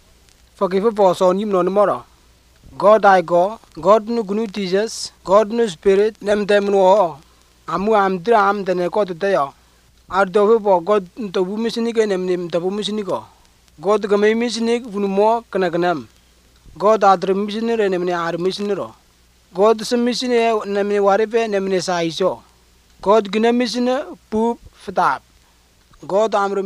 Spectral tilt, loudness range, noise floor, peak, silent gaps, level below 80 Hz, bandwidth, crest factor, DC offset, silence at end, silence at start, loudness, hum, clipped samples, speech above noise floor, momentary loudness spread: -5.5 dB/octave; 3 LU; -54 dBFS; -2 dBFS; none; -54 dBFS; 13 kHz; 16 dB; under 0.1%; 0 s; 0.6 s; -18 LUFS; none; under 0.1%; 37 dB; 10 LU